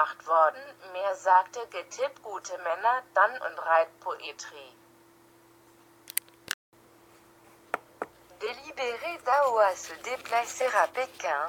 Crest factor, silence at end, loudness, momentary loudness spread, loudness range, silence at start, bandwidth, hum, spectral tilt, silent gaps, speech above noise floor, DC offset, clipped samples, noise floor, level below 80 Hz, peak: 26 dB; 0 s; -28 LUFS; 16 LU; 12 LU; 0 s; 19 kHz; none; -0.5 dB/octave; 6.54-6.72 s; 30 dB; under 0.1%; under 0.1%; -58 dBFS; -78 dBFS; -4 dBFS